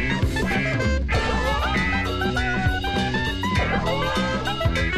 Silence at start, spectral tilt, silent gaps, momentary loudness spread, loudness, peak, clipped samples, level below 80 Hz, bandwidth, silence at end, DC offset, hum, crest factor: 0 s; -5.5 dB/octave; none; 2 LU; -23 LUFS; -8 dBFS; under 0.1%; -28 dBFS; 15 kHz; 0 s; under 0.1%; none; 14 dB